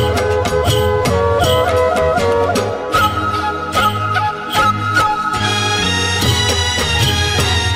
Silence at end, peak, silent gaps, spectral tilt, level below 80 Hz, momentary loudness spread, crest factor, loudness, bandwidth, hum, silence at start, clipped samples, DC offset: 0 s; -2 dBFS; none; -4 dB/octave; -34 dBFS; 3 LU; 12 dB; -14 LUFS; 16 kHz; none; 0 s; under 0.1%; under 0.1%